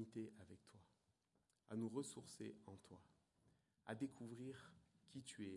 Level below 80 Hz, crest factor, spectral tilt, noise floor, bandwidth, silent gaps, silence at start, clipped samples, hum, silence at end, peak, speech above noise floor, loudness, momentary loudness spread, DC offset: -90 dBFS; 20 dB; -5.5 dB/octave; -86 dBFS; 11.5 kHz; none; 0 s; under 0.1%; none; 0 s; -34 dBFS; 33 dB; -54 LUFS; 17 LU; under 0.1%